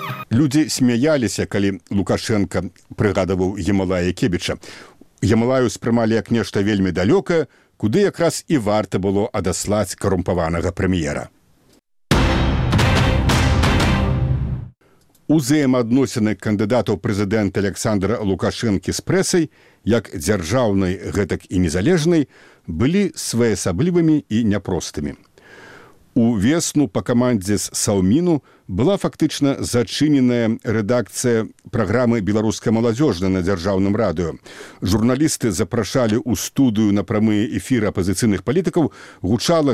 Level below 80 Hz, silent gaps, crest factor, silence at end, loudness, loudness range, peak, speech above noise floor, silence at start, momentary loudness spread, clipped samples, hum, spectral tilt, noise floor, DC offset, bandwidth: -34 dBFS; none; 16 dB; 0 s; -19 LUFS; 2 LU; -4 dBFS; 38 dB; 0 s; 7 LU; under 0.1%; none; -5.5 dB/octave; -56 dBFS; 0.2%; 16 kHz